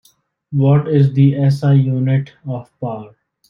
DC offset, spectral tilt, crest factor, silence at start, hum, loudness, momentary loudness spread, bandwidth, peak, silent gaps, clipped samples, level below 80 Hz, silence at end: under 0.1%; -10 dB/octave; 14 dB; 0.5 s; none; -15 LUFS; 14 LU; 5.6 kHz; -2 dBFS; none; under 0.1%; -56 dBFS; 0.45 s